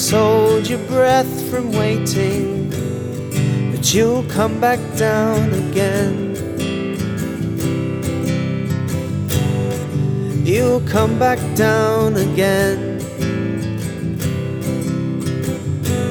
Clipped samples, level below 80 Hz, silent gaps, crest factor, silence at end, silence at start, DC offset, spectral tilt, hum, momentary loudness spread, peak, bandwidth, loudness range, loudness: under 0.1%; -42 dBFS; none; 14 dB; 0 s; 0 s; under 0.1%; -5.5 dB/octave; none; 8 LU; -2 dBFS; over 20 kHz; 4 LU; -18 LUFS